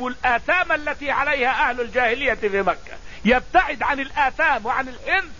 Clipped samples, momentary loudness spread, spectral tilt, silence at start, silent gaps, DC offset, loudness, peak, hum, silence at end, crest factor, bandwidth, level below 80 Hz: under 0.1%; 6 LU; -4.5 dB/octave; 0 s; none; 1%; -20 LUFS; -4 dBFS; none; 0 s; 18 dB; 7.4 kHz; -42 dBFS